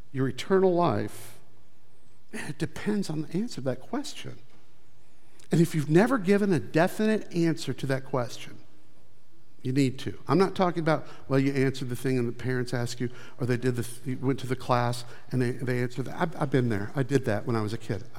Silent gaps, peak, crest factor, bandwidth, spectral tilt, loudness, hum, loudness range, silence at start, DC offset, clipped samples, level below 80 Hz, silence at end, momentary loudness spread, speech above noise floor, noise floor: none; -8 dBFS; 20 dB; 16 kHz; -6.5 dB/octave; -28 LUFS; none; 8 LU; 0.15 s; 2%; under 0.1%; -64 dBFS; 0 s; 12 LU; 35 dB; -63 dBFS